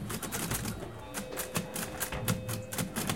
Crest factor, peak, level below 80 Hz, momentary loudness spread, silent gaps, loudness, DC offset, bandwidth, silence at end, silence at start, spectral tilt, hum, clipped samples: 22 dB; -14 dBFS; -50 dBFS; 6 LU; none; -35 LUFS; 0.2%; 17 kHz; 0 s; 0 s; -3.5 dB/octave; none; under 0.1%